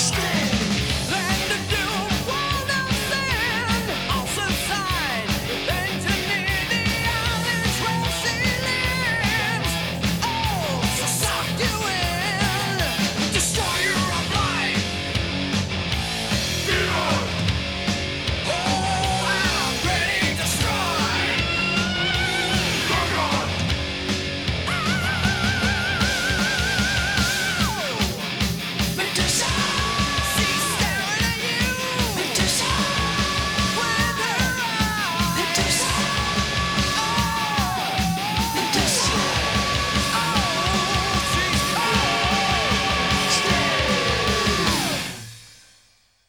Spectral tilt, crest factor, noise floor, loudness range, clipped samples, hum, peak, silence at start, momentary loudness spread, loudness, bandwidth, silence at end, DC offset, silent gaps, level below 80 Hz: -3 dB/octave; 16 dB; -59 dBFS; 2 LU; under 0.1%; none; -6 dBFS; 0 s; 4 LU; -21 LUFS; over 20 kHz; 0.75 s; under 0.1%; none; -36 dBFS